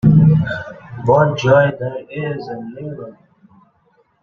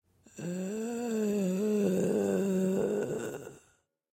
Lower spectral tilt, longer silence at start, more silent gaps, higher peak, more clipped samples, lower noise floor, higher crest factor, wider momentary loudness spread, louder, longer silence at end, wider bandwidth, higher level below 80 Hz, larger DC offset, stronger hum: first, -8.5 dB/octave vs -7 dB/octave; second, 0.05 s vs 0.35 s; neither; first, 0 dBFS vs -18 dBFS; neither; second, -59 dBFS vs -70 dBFS; about the same, 16 dB vs 14 dB; first, 18 LU vs 11 LU; first, -16 LUFS vs -31 LUFS; first, 1.1 s vs 0.55 s; second, 6.6 kHz vs 16 kHz; first, -46 dBFS vs -72 dBFS; neither; neither